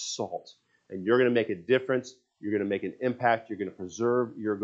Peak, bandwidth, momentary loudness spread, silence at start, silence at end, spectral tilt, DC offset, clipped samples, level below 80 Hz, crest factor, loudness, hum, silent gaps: -10 dBFS; 7.8 kHz; 12 LU; 0 s; 0 s; -5 dB/octave; under 0.1%; under 0.1%; -78 dBFS; 18 dB; -28 LUFS; none; none